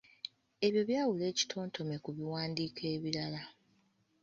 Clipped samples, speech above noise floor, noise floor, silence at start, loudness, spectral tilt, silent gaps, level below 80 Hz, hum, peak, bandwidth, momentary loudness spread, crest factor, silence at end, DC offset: under 0.1%; 38 dB; -73 dBFS; 0.25 s; -36 LUFS; -4.5 dB/octave; none; -74 dBFS; none; -18 dBFS; 7.4 kHz; 14 LU; 20 dB; 0.7 s; under 0.1%